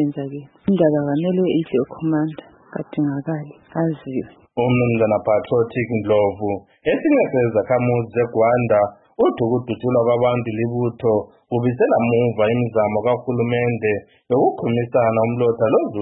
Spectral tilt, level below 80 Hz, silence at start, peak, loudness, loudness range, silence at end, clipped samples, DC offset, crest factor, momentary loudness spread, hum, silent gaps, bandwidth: -12.5 dB/octave; -56 dBFS; 0 s; -4 dBFS; -19 LUFS; 4 LU; 0 s; under 0.1%; under 0.1%; 16 dB; 9 LU; none; none; 4 kHz